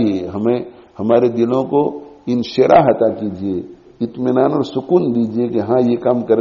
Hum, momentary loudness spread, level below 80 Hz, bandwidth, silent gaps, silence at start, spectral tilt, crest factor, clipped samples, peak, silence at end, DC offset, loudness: none; 13 LU; -54 dBFS; 7.2 kHz; none; 0 s; -6.5 dB/octave; 14 dB; under 0.1%; 0 dBFS; 0 s; under 0.1%; -16 LUFS